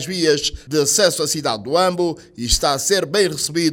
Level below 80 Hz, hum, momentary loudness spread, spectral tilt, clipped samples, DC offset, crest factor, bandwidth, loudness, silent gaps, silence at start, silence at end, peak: -36 dBFS; none; 6 LU; -3 dB/octave; under 0.1%; under 0.1%; 16 dB; 17 kHz; -18 LUFS; none; 0 s; 0 s; -2 dBFS